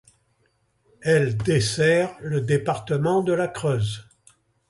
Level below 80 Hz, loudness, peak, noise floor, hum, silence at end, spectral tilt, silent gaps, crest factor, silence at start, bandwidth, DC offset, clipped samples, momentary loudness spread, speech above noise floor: -52 dBFS; -23 LUFS; -6 dBFS; -67 dBFS; none; 0.65 s; -5.5 dB/octave; none; 16 dB; 1 s; 11.5 kHz; under 0.1%; under 0.1%; 7 LU; 45 dB